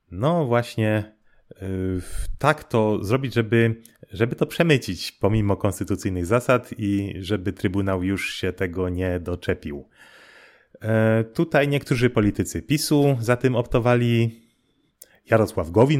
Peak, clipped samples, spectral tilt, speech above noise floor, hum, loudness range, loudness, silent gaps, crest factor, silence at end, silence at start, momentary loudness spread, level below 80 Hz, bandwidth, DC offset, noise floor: -2 dBFS; under 0.1%; -6.5 dB/octave; 45 dB; none; 5 LU; -23 LUFS; none; 20 dB; 0 s; 0.1 s; 8 LU; -42 dBFS; 16 kHz; under 0.1%; -66 dBFS